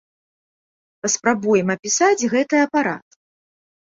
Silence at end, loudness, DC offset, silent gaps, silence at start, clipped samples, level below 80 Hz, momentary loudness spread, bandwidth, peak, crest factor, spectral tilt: 0.85 s; -19 LUFS; under 0.1%; 1.79-1.83 s; 1.05 s; under 0.1%; -64 dBFS; 8 LU; 7.8 kHz; -2 dBFS; 18 dB; -3.5 dB/octave